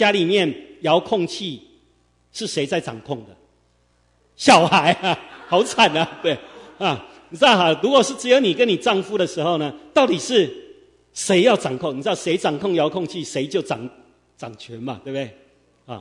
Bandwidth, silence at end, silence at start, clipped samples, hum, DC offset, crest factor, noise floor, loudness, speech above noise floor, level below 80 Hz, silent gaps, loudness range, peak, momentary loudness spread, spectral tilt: 11 kHz; 0 s; 0 s; under 0.1%; 60 Hz at -55 dBFS; under 0.1%; 20 dB; -61 dBFS; -19 LUFS; 42 dB; -62 dBFS; none; 8 LU; 0 dBFS; 17 LU; -4 dB/octave